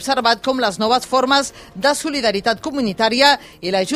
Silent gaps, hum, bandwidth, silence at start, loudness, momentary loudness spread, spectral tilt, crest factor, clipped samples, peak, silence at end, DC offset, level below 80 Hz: none; none; 15.5 kHz; 0 s; -17 LUFS; 7 LU; -3 dB/octave; 18 dB; under 0.1%; 0 dBFS; 0 s; under 0.1%; -52 dBFS